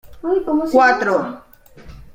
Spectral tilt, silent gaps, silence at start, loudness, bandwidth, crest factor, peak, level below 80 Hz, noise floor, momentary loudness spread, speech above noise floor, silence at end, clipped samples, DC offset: -5.5 dB/octave; none; 0.05 s; -16 LUFS; 16.5 kHz; 16 dB; -2 dBFS; -46 dBFS; -41 dBFS; 14 LU; 25 dB; 0.15 s; under 0.1%; under 0.1%